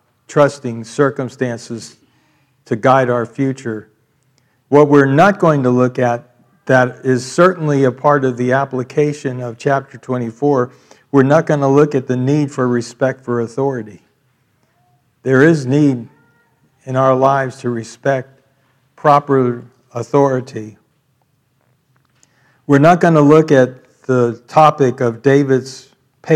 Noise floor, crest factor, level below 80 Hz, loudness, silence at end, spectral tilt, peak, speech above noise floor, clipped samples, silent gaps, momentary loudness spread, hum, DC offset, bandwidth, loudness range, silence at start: -61 dBFS; 16 dB; -60 dBFS; -14 LUFS; 0 s; -7 dB/octave; 0 dBFS; 48 dB; 0.2%; none; 15 LU; none; under 0.1%; 10.5 kHz; 6 LU; 0.3 s